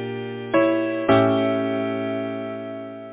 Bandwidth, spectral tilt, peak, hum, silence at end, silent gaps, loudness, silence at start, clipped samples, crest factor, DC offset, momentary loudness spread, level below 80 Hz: 4 kHz; -10.5 dB/octave; -4 dBFS; none; 0 s; none; -22 LUFS; 0 s; under 0.1%; 20 dB; under 0.1%; 13 LU; -58 dBFS